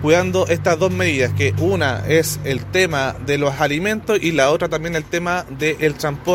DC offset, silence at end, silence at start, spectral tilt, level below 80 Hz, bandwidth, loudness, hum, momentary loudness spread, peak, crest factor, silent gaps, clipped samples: under 0.1%; 0 s; 0 s; -5 dB/octave; -42 dBFS; 16.5 kHz; -18 LUFS; none; 5 LU; -2 dBFS; 16 dB; none; under 0.1%